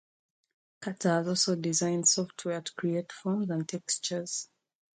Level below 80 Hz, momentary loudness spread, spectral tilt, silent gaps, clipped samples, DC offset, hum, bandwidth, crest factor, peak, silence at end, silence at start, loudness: -76 dBFS; 11 LU; -3.5 dB/octave; none; under 0.1%; under 0.1%; none; 9.6 kHz; 18 dB; -12 dBFS; 0.5 s; 0.8 s; -30 LUFS